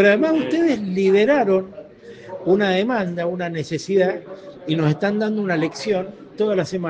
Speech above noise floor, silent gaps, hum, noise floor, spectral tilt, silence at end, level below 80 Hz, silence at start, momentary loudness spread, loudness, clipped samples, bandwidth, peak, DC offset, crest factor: 21 dB; none; none; -40 dBFS; -6.5 dB/octave; 0 s; -62 dBFS; 0 s; 17 LU; -20 LUFS; under 0.1%; 8.8 kHz; -2 dBFS; under 0.1%; 16 dB